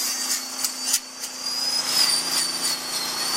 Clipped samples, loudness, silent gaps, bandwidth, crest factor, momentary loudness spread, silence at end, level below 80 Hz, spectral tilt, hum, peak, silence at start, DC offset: under 0.1%; -22 LUFS; none; 16.5 kHz; 18 dB; 8 LU; 0 s; -70 dBFS; 1.5 dB/octave; none; -6 dBFS; 0 s; under 0.1%